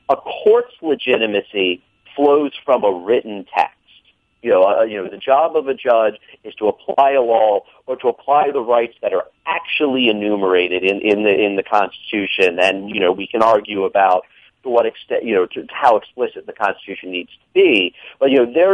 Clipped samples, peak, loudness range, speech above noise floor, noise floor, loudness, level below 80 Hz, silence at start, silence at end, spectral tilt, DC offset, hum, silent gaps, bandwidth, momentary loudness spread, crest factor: under 0.1%; 0 dBFS; 2 LU; 38 dB; -54 dBFS; -17 LUFS; -62 dBFS; 0.1 s; 0 s; -5.5 dB/octave; under 0.1%; none; none; 9.2 kHz; 9 LU; 16 dB